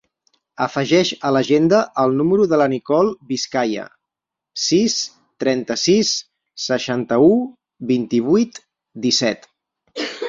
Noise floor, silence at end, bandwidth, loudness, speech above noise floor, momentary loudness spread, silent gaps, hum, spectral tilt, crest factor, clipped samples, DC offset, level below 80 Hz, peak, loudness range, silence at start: -85 dBFS; 0 s; 7.6 kHz; -18 LUFS; 68 dB; 13 LU; none; none; -4.5 dB/octave; 16 dB; under 0.1%; under 0.1%; -60 dBFS; -2 dBFS; 3 LU; 0.6 s